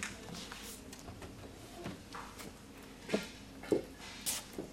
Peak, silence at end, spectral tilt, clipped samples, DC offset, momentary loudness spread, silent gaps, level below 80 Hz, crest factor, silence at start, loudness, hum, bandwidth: -18 dBFS; 0 s; -3.5 dB/octave; under 0.1%; under 0.1%; 13 LU; none; -60 dBFS; 26 dB; 0 s; -43 LUFS; none; 16 kHz